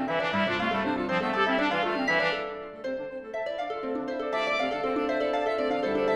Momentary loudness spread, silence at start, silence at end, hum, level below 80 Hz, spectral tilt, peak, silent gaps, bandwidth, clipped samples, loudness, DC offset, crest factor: 10 LU; 0 s; 0 s; none; -60 dBFS; -5.5 dB/octave; -12 dBFS; none; 11 kHz; under 0.1%; -28 LUFS; under 0.1%; 16 dB